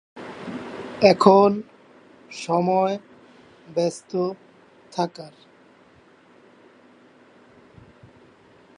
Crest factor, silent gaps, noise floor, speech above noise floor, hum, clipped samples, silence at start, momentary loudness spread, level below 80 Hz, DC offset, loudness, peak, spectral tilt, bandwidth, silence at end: 24 dB; none; -54 dBFS; 34 dB; none; under 0.1%; 0.15 s; 25 LU; -66 dBFS; under 0.1%; -21 LUFS; 0 dBFS; -6 dB/octave; 10.5 kHz; 3.5 s